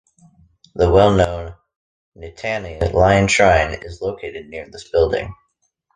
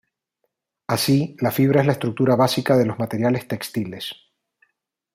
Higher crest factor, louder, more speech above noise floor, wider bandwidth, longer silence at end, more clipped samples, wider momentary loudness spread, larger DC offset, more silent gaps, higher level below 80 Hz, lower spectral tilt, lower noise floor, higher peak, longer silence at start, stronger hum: about the same, 18 dB vs 18 dB; first, -17 LUFS vs -20 LUFS; second, 51 dB vs 55 dB; second, 9.8 kHz vs 16 kHz; second, 0.65 s vs 1 s; neither; first, 20 LU vs 11 LU; neither; first, 1.76-2.12 s vs none; first, -32 dBFS vs -60 dBFS; about the same, -5.5 dB/octave vs -6 dB/octave; second, -68 dBFS vs -75 dBFS; first, 0 dBFS vs -4 dBFS; second, 0.75 s vs 0.9 s; neither